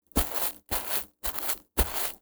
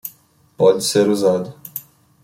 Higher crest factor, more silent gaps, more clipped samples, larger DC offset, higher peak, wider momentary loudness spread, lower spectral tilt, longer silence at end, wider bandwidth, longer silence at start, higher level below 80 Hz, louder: first, 26 dB vs 16 dB; neither; neither; neither; about the same, -4 dBFS vs -2 dBFS; second, 3 LU vs 17 LU; second, -3 dB/octave vs -4.5 dB/octave; second, 0.05 s vs 0.45 s; first, over 20 kHz vs 16.5 kHz; about the same, 0.15 s vs 0.05 s; first, -38 dBFS vs -62 dBFS; second, -27 LUFS vs -16 LUFS